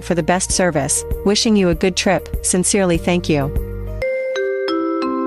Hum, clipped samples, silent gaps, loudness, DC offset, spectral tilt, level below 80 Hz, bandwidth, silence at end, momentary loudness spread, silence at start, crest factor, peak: none; under 0.1%; none; -17 LUFS; under 0.1%; -4 dB/octave; -30 dBFS; 15.5 kHz; 0 s; 7 LU; 0 s; 12 dB; -4 dBFS